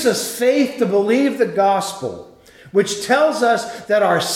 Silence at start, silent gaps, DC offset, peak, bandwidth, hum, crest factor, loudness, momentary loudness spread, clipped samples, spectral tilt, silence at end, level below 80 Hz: 0 s; none; under 0.1%; -2 dBFS; 17 kHz; none; 14 dB; -17 LUFS; 7 LU; under 0.1%; -4 dB/octave; 0 s; -62 dBFS